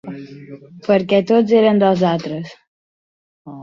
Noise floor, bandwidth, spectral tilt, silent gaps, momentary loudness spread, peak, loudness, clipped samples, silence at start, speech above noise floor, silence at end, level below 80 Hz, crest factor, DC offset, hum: under -90 dBFS; 7.2 kHz; -7.5 dB/octave; 2.67-3.45 s; 22 LU; -2 dBFS; -15 LUFS; under 0.1%; 0.05 s; over 74 dB; 0 s; -60 dBFS; 16 dB; under 0.1%; none